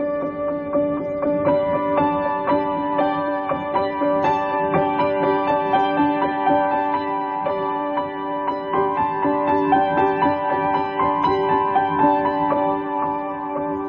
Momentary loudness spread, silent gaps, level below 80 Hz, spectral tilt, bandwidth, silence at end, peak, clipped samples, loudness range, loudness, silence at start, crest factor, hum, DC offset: 6 LU; none; -52 dBFS; -8.5 dB/octave; 6.4 kHz; 0 s; -6 dBFS; under 0.1%; 2 LU; -20 LUFS; 0 s; 14 dB; none; under 0.1%